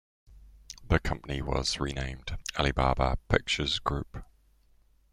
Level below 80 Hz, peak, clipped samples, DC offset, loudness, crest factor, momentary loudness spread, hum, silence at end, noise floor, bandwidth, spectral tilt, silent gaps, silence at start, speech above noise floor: -38 dBFS; -6 dBFS; under 0.1%; under 0.1%; -30 LUFS; 26 dB; 12 LU; none; 0.9 s; -63 dBFS; 14.5 kHz; -4.5 dB/octave; none; 0.3 s; 34 dB